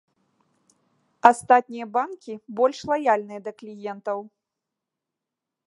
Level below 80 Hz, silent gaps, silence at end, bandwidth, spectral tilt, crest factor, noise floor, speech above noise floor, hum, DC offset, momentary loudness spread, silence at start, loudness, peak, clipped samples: -70 dBFS; none; 1.4 s; 11.5 kHz; -4.5 dB/octave; 26 dB; -86 dBFS; 63 dB; none; under 0.1%; 17 LU; 1.25 s; -22 LUFS; 0 dBFS; under 0.1%